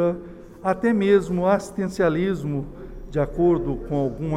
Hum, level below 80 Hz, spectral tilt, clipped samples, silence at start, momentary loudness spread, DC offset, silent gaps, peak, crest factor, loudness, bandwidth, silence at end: none; -40 dBFS; -7.5 dB/octave; under 0.1%; 0 s; 12 LU; under 0.1%; none; -6 dBFS; 16 dB; -23 LUFS; 12.5 kHz; 0 s